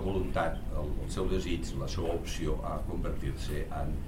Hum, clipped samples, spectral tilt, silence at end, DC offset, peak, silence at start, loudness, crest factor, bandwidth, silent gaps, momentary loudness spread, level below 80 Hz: none; under 0.1%; -6 dB/octave; 0 s; under 0.1%; -18 dBFS; 0 s; -35 LUFS; 14 dB; 16 kHz; none; 5 LU; -36 dBFS